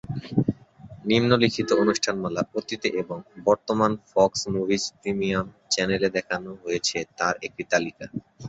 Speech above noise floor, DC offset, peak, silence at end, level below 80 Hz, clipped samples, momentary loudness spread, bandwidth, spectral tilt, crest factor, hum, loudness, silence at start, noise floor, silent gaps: 21 dB; under 0.1%; -4 dBFS; 0 s; -56 dBFS; under 0.1%; 10 LU; 8.2 kHz; -4.5 dB/octave; 22 dB; none; -25 LUFS; 0.1 s; -46 dBFS; none